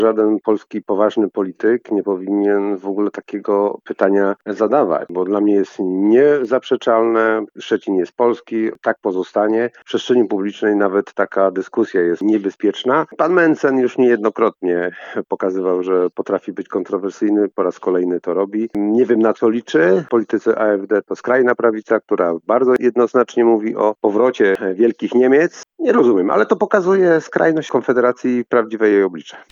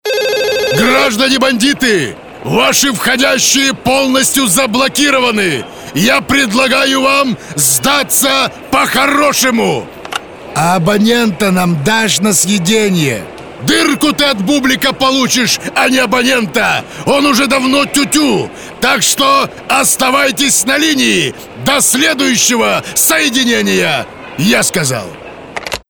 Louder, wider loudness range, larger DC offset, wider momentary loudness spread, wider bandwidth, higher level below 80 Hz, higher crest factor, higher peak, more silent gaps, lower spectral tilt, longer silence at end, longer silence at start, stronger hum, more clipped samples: second, -17 LUFS vs -10 LUFS; about the same, 4 LU vs 2 LU; second, under 0.1% vs 0.5%; about the same, 7 LU vs 7 LU; second, 7.4 kHz vs over 20 kHz; second, -70 dBFS vs -44 dBFS; about the same, 16 dB vs 12 dB; about the same, 0 dBFS vs 0 dBFS; neither; first, -6.5 dB/octave vs -2.5 dB/octave; about the same, 0.1 s vs 0.1 s; about the same, 0 s vs 0.05 s; neither; neither